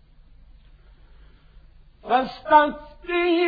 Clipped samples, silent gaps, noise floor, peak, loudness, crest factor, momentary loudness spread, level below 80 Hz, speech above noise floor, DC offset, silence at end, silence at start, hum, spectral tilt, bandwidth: under 0.1%; none; -50 dBFS; -4 dBFS; -21 LUFS; 20 dB; 17 LU; -50 dBFS; 30 dB; under 0.1%; 0 s; 2.05 s; none; -6.5 dB/octave; 5 kHz